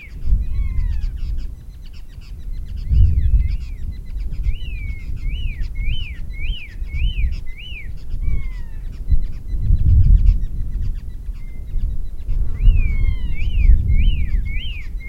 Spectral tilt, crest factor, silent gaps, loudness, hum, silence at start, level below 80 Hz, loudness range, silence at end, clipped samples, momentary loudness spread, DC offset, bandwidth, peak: -7 dB/octave; 18 dB; none; -23 LUFS; none; 0 s; -18 dBFS; 6 LU; 0 s; under 0.1%; 16 LU; under 0.1%; 5.2 kHz; 0 dBFS